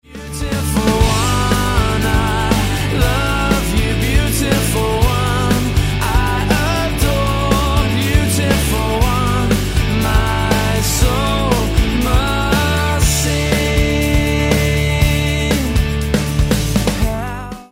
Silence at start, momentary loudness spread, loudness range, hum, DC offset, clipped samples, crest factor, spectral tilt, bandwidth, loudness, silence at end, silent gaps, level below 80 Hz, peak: 0.1 s; 2 LU; 1 LU; none; under 0.1%; under 0.1%; 14 dB; -5 dB/octave; 16.5 kHz; -16 LUFS; 0.05 s; none; -20 dBFS; 0 dBFS